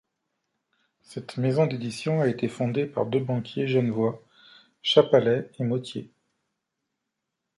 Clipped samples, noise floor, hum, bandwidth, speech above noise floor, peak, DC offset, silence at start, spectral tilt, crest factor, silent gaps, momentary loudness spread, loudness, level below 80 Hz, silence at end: under 0.1%; -83 dBFS; none; 11.5 kHz; 58 dB; -4 dBFS; under 0.1%; 1.1 s; -6.5 dB/octave; 22 dB; none; 16 LU; -25 LUFS; -68 dBFS; 1.5 s